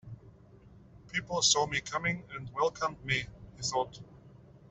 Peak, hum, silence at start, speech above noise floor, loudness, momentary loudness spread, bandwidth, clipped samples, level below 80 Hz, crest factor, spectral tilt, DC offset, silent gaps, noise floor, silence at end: -12 dBFS; none; 0.05 s; 24 dB; -31 LUFS; 19 LU; 8.2 kHz; under 0.1%; -58 dBFS; 24 dB; -2 dB/octave; under 0.1%; none; -56 dBFS; 0.1 s